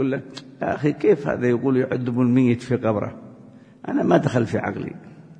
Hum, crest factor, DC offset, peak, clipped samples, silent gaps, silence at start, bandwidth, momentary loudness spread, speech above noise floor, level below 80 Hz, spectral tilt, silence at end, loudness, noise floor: none; 18 dB; under 0.1%; -4 dBFS; under 0.1%; none; 0 s; 9.6 kHz; 15 LU; 25 dB; -58 dBFS; -8 dB/octave; 0.05 s; -21 LUFS; -46 dBFS